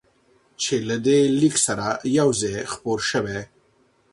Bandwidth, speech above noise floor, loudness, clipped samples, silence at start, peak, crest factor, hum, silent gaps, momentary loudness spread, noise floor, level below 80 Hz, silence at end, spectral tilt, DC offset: 11.5 kHz; 40 dB; -21 LUFS; under 0.1%; 0.6 s; -6 dBFS; 16 dB; none; none; 10 LU; -62 dBFS; -56 dBFS; 0.65 s; -4 dB/octave; under 0.1%